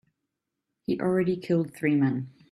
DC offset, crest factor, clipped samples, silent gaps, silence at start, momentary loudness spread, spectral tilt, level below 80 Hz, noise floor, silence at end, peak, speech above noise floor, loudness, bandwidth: under 0.1%; 16 dB; under 0.1%; none; 0.9 s; 9 LU; -8.5 dB/octave; -66 dBFS; -84 dBFS; 0.25 s; -12 dBFS; 58 dB; -27 LUFS; 13 kHz